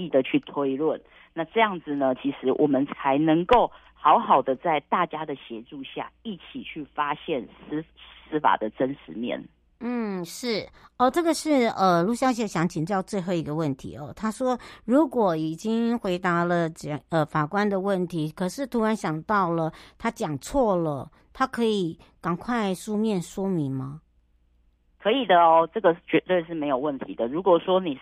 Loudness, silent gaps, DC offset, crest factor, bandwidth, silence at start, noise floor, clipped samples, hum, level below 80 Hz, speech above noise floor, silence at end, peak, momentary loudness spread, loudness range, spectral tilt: -25 LUFS; none; under 0.1%; 20 dB; 15 kHz; 0 s; -63 dBFS; under 0.1%; none; -54 dBFS; 39 dB; 0 s; -6 dBFS; 13 LU; 7 LU; -6 dB/octave